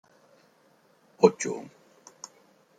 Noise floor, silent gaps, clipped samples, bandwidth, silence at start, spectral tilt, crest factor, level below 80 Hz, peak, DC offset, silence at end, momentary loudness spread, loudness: -63 dBFS; none; under 0.1%; 9.4 kHz; 1.2 s; -5 dB/octave; 28 dB; -78 dBFS; -2 dBFS; under 0.1%; 1.15 s; 24 LU; -25 LUFS